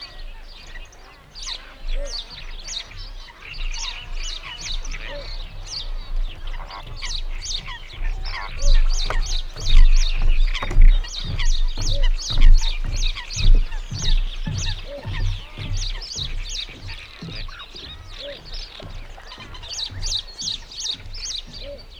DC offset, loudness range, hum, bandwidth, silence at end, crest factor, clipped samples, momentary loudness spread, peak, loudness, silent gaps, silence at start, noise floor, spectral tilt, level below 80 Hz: under 0.1%; 10 LU; none; 7.4 kHz; 0 s; 16 dB; under 0.1%; 15 LU; -2 dBFS; -27 LUFS; none; 0 s; -44 dBFS; -2.5 dB/octave; -20 dBFS